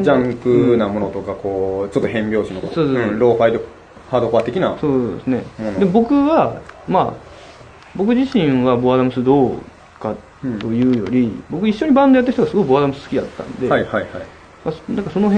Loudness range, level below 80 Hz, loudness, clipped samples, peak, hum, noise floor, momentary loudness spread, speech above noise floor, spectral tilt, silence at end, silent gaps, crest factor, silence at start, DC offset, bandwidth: 2 LU; -46 dBFS; -17 LUFS; under 0.1%; 0 dBFS; none; -40 dBFS; 13 LU; 24 dB; -8 dB/octave; 0 s; none; 16 dB; 0 s; under 0.1%; 9 kHz